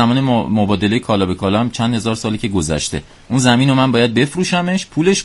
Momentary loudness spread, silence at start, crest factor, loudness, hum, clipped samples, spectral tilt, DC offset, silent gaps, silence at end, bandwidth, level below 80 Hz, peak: 7 LU; 0 s; 16 dB; -16 LUFS; none; under 0.1%; -5 dB/octave; under 0.1%; none; 0 s; 11.5 kHz; -40 dBFS; 0 dBFS